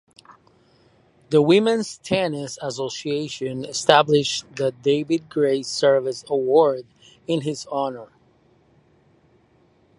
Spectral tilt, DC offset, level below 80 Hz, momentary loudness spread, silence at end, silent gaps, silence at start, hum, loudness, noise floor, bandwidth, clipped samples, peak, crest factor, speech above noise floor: -4.5 dB/octave; under 0.1%; -64 dBFS; 12 LU; 1.95 s; none; 1.3 s; none; -21 LUFS; -59 dBFS; 11.5 kHz; under 0.1%; 0 dBFS; 22 dB; 38 dB